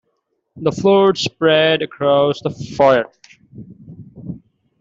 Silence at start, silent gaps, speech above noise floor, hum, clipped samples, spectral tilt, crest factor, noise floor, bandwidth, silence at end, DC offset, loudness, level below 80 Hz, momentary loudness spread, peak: 0.55 s; none; 54 dB; none; under 0.1%; -5.5 dB/octave; 16 dB; -69 dBFS; 7.8 kHz; 0.45 s; under 0.1%; -15 LUFS; -54 dBFS; 20 LU; -2 dBFS